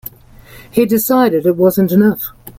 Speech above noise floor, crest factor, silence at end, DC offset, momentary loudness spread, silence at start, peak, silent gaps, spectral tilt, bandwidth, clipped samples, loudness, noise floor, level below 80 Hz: 28 dB; 14 dB; 0.1 s; under 0.1%; 9 LU; 0.55 s; 0 dBFS; none; -6.5 dB/octave; 16.5 kHz; under 0.1%; -13 LUFS; -40 dBFS; -48 dBFS